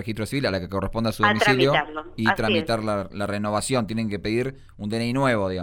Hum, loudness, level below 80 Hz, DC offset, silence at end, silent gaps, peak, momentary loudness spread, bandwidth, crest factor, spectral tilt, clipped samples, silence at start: none; -23 LUFS; -44 dBFS; under 0.1%; 0 s; none; -4 dBFS; 9 LU; 19 kHz; 18 dB; -5 dB/octave; under 0.1%; 0 s